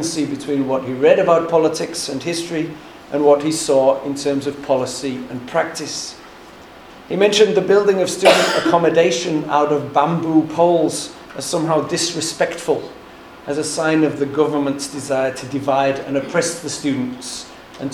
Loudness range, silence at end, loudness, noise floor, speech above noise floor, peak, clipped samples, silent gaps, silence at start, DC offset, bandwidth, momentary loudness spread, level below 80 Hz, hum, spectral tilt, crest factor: 6 LU; 0 s; -18 LUFS; -40 dBFS; 22 dB; 0 dBFS; under 0.1%; none; 0 s; under 0.1%; 17.5 kHz; 12 LU; -56 dBFS; none; -4 dB/octave; 18 dB